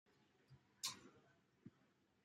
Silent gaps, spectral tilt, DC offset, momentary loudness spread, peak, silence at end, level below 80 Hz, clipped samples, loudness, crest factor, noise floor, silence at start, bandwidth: none; -1 dB/octave; under 0.1%; 19 LU; -30 dBFS; 0.4 s; under -90 dBFS; under 0.1%; -50 LUFS; 28 dB; -79 dBFS; 0.1 s; 13 kHz